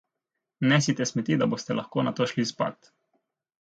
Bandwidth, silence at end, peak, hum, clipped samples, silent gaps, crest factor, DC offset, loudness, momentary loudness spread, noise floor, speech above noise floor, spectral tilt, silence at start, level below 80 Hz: 9.2 kHz; 0.85 s; -6 dBFS; none; under 0.1%; none; 22 dB; under 0.1%; -26 LUFS; 7 LU; -85 dBFS; 59 dB; -5 dB/octave; 0.6 s; -70 dBFS